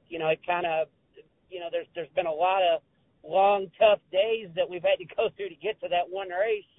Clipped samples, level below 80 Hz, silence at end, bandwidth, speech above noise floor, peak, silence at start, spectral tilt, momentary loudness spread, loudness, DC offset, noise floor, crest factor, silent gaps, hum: under 0.1%; -68 dBFS; 0.15 s; 4 kHz; 31 dB; -8 dBFS; 0.1 s; -8 dB/octave; 11 LU; -27 LUFS; under 0.1%; -58 dBFS; 20 dB; none; none